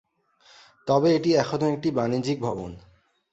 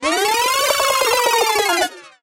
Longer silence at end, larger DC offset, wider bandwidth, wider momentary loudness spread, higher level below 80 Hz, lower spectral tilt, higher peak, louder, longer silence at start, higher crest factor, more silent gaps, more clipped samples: first, 0.55 s vs 0.15 s; neither; second, 8 kHz vs 16 kHz; first, 14 LU vs 3 LU; about the same, -58 dBFS vs -54 dBFS; first, -6.5 dB/octave vs 0 dB/octave; about the same, -6 dBFS vs -4 dBFS; second, -24 LUFS vs -16 LUFS; first, 0.85 s vs 0 s; about the same, 18 dB vs 14 dB; neither; neither